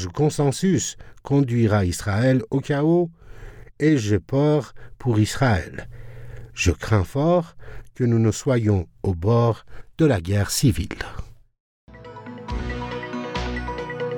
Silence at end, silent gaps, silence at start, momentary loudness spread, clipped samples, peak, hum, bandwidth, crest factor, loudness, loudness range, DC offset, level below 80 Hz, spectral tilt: 0 s; 11.60-11.87 s; 0 s; 17 LU; under 0.1%; -6 dBFS; none; 18.5 kHz; 16 dB; -22 LUFS; 4 LU; under 0.1%; -40 dBFS; -6 dB/octave